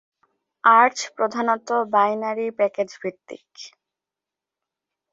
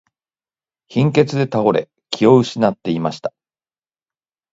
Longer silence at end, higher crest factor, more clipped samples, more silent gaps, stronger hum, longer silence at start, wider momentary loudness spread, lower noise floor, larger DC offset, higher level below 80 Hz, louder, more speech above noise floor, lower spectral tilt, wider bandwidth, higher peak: first, 1.45 s vs 1.25 s; about the same, 20 dB vs 18 dB; neither; neither; neither; second, 0.65 s vs 0.9 s; first, 25 LU vs 13 LU; about the same, -88 dBFS vs under -90 dBFS; neither; second, -78 dBFS vs -60 dBFS; second, -20 LUFS vs -17 LUFS; second, 67 dB vs over 74 dB; second, -3.5 dB/octave vs -7 dB/octave; about the same, 8 kHz vs 8 kHz; about the same, -2 dBFS vs 0 dBFS